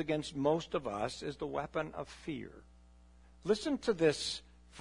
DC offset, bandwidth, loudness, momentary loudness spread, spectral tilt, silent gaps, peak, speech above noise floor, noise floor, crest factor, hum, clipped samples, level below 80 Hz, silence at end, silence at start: under 0.1%; 11 kHz; -36 LUFS; 13 LU; -5 dB/octave; none; -18 dBFS; 25 dB; -60 dBFS; 20 dB; none; under 0.1%; -60 dBFS; 0 s; 0 s